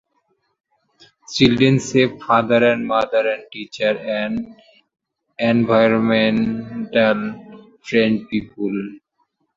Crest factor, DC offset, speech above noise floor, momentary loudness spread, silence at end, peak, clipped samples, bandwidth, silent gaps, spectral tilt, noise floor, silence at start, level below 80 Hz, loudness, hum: 18 dB; under 0.1%; 50 dB; 13 LU; 0.6 s; -2 dBFS; under 0.1%; 7.8 kHz; none; -6 dB/octave; -68 dBFS; 1.3 s; -54 dBFS; -18 LUFS; none